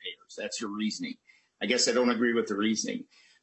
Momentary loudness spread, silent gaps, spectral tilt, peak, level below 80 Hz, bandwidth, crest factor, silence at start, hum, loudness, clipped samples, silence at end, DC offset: 15 LU; none; -3 dB/octave; -12 dBFS; -76 dBFS; 8.4 kHz; 20 dB; 0 s; none; -29 LUFS; under 0.1%; 0.4 s; under 0.1%